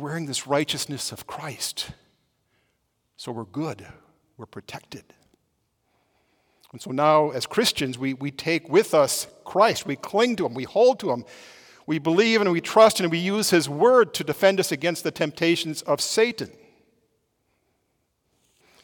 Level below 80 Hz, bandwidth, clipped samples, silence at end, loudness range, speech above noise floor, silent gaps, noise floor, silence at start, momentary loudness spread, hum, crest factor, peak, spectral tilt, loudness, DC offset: -66 dBFS; 19 kHz; under 0.1%; 2.35 s; 18 LU; 50 dB; none; -73 dBFS; 0 s; 19 LU; none; 20 dB; -4 dBFS; -4 dB/octave; -22 LUFS; under 0.1%